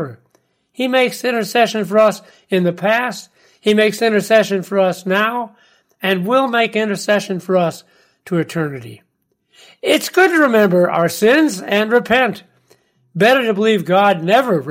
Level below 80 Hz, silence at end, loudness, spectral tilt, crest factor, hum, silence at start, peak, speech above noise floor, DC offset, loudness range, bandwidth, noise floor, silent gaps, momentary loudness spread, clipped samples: -62 dBFS; 0 s; -15 LUFS; -5 dB/octave; 14 dB; none; 0 s; -2 dBFS; 46 dB; under 0.1%; 4 LU; 16.5 kHz; -61 dBFS; none; 10 LU; under 0.1%